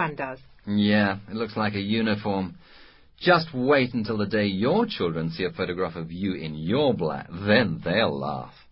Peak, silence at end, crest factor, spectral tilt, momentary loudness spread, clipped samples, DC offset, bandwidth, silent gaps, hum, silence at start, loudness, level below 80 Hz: -6 dBFS; 0.2 s; 18 dB; -10.5 dB/octave; 9 LU; under 0.1%; under 0.1%; 5.8 kHz; none; none; 0 s; -25 LUFS; -52 dBFS